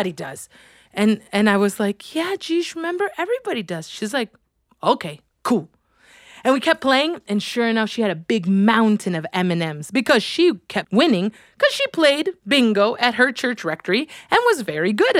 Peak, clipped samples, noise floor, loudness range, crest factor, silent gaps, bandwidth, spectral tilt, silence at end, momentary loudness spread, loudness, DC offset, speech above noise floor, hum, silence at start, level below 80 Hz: -2 dBFS; under 0.1%; -52 dBFS; 6 LU; 20 dB; none; 15.5 kHz; -5 dB/octave; 0 s; 9 LU; -20 LUFS; under 0.1%; 32 dB; none; 0 s; -66 dBFS